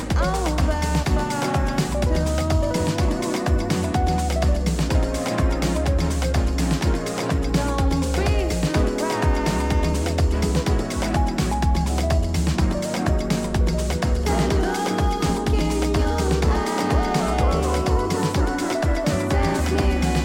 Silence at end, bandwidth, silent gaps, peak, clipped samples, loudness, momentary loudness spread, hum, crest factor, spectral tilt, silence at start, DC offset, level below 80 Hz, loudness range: 0 s; 16.5 kHz; none; -8 dBFS; under 0.1%; -22 LUFS; 2 LU; none; 12 dB; -6 dB/octave; 0 s; under 0.1%; -24 dBFS; 1 LU